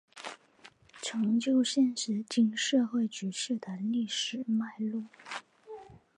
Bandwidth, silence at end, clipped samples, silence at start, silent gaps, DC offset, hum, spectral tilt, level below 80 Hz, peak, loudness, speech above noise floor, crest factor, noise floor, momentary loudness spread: 10.5 kHz; 0.25 s; under 0.1%; 0.15 s; none; under 0.1%; none; -4 dB/octave; -78 dBFS; -16 dBFS; -31 LUFS; 28 dB; 16 dB; -59 dBFS; 18 LU